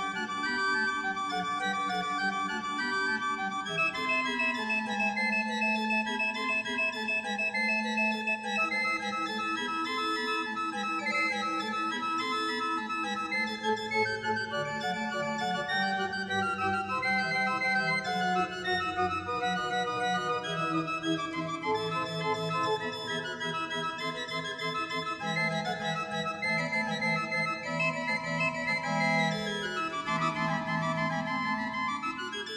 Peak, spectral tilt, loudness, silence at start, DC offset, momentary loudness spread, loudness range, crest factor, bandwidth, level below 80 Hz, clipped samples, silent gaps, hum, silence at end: -16 dBFS; -4 dB/octave; -30 LUFS; 0 s; under 0.1%; 5 LU; 3 LU; 14 dB; 13 kHz; -68 dBFS; under 0.1%; none; none; 0 s